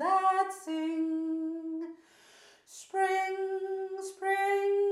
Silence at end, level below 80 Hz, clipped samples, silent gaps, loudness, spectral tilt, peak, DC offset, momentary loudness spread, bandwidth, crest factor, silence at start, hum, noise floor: 0 s; under -90 dBFS; under 0.1%; none; -31 LUFS; -2 dB/octave; -16 dBFS; under 0.1%; 11 LU; 13.5 kHz; 16 dB; 0 s; none; -59 dBFS